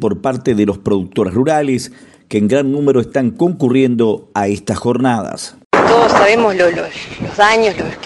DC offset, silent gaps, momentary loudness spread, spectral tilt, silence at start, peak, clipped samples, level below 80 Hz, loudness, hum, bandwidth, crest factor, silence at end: under 0.1%; 5.65-5.70 s; 11 LU; -5.5 dB/octave; 0 s; 0 dBFS; under 0.1%; -46 dBFS; -14 LUFS; none; 11.5 kHz; 14 dB; 0 s